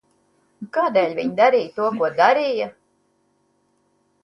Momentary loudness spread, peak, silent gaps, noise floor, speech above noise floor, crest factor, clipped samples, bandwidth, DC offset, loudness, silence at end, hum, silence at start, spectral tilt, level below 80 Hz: 10 LU; -2 dBFS; none; -65 dBFS; 47 dB; 20 dB; under 0.1%; 10.5 kHz; under 0.1%; -20 LUFS; 1.55 s; none; 0.6 s; -5.5 dB/octave; -70 dBFS